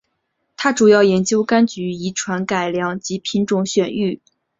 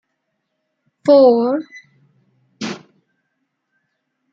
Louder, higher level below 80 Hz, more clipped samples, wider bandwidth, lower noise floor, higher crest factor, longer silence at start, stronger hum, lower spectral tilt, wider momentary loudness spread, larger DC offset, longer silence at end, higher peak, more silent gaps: second, -18 LUFS vs -15 LUFS; first, -58 dBFS vs -74 dBFS; neither; about the same, 7.8 kHz vs 7.6 kHz; about the same, -71 dBFS vs -73 dBFS; about the same, 16 dB vs 18 dB; second, 0.6 s vs 1.05 s; neither; second, -4.5 dB/octave vs -6 dB/octave; second, 11 LU vs 22 LU; neither; second, 0.45 s vs 1.55 s; about the same, -2 dBFS vs -2 dBFS; neither